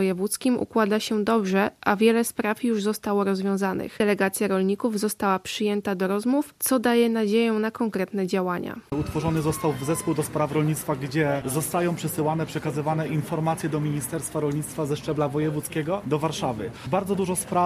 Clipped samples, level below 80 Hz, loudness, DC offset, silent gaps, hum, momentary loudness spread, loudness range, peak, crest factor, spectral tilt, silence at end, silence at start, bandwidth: under 0.1%; -54 dBFS; -25 LUFS; under 0.1%; none; none; 6 LU; 3 LU; -6 dBFS; 18 dB; -5.5 dB/octave; 0 s; 0 s; 15 kHz